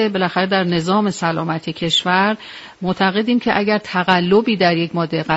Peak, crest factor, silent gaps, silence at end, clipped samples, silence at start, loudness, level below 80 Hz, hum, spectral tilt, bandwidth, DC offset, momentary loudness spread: 0 dBFS; 18 dB; none; 0 s; under 0.1%; 0 s; -17 LUFS; -54 dBFS; none; -5.5 dB/octave; 8 kHz; under 0.1%; 8 LU